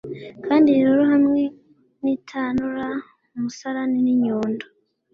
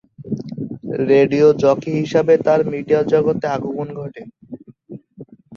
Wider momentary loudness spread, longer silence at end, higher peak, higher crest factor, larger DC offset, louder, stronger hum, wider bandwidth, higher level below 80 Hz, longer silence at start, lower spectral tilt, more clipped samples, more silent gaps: second, 16 LU vs 21 LU; first, 0.5 s vs 0 s; second, -6 dBFS vs -2 dBFS; about the same, 14 dB vs 16 dB; neither; second, -21 LUFS vs -17 LUFS; neither; about the same, 6.8 kHz vs 7 kHz; about the same, -60 dBFS vs -56 dBFS; second, 0.05 s vs 0.2 s; about the same, -6.5 dB/octave vs -7.5 dB/octave; neither; neither